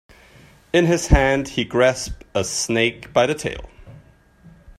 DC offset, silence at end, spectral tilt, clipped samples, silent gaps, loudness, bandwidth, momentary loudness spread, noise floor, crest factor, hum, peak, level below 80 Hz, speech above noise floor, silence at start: under 0.1%; 0.3 s; -4.5 dB/octave; under 0.1%; none; -20 LUFS; 14 kHz; 10 LU; -50 dBFS; 20 dB; none; 0 dBFS; -30 dBFS; 31 dB; 0.75 s